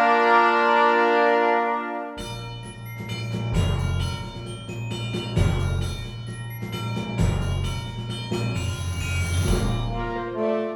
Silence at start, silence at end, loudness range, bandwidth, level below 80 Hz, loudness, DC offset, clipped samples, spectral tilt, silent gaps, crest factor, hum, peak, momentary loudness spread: 0 s; 0 s; 6 LU; 17.5 kHz; -34 dBFS; -24 LUFS; under 0.1%; under 0.1%; -5.5 dB/octave; none; 18 dB; none; -6 dBFS; 16 LU